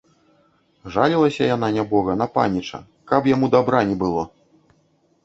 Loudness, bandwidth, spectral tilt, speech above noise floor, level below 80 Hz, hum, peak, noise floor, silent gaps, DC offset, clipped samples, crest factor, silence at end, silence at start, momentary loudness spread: -20 LUFS; 8 kHz; -7 dB/octave; 43 dB; -52 dBFS; none; -2 dBFS; -62 dBFS; none; under 0.1%; under 0.1%; 20 dB; 1 s; 0.85 s; 10 LU